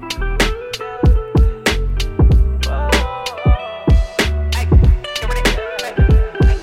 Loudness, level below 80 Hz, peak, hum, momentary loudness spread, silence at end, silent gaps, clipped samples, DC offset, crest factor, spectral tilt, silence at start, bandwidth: -17 LUFS; -16 dBFS; -2 dBFS; none; 8 LU; 0 s; none; under 0.1%; under 0.1%; 14 dB; -5.5 dB/octave; 0 s; 14.5 kHz